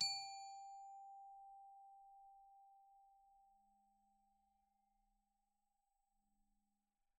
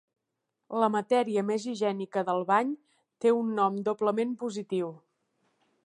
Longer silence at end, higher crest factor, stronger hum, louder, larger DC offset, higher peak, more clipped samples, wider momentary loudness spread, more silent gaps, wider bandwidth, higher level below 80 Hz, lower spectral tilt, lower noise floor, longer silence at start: first, 3.45 s vs 0.9 s; first, 28 dB vs 18 dB; neither; second, -52 LUFS vs -29 LUFS; neither; second, -28 dBFS vs -10 dBFS; neither; first, 19 LU vs 8 LU; neither; about the same, 11 kHz vs 11.5 kHz; second, under -90 dBFS vs -82 dBFS; second, 2 dB/octave vs -6 dB/octave; first, -88 dBFS vs -83 dBFS; second, 0 s vs 0.7 s